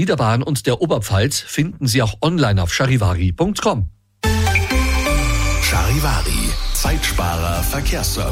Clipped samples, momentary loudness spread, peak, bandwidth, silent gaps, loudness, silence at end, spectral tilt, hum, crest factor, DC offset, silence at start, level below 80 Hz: under 0.1%; 4 LU; -4 dBFS; 16.5 kHz; none; -18 LUFS; 0 s; -4.5 dB/octave; none; 12 dB; under 0.1%; 0 s; -24 dBFS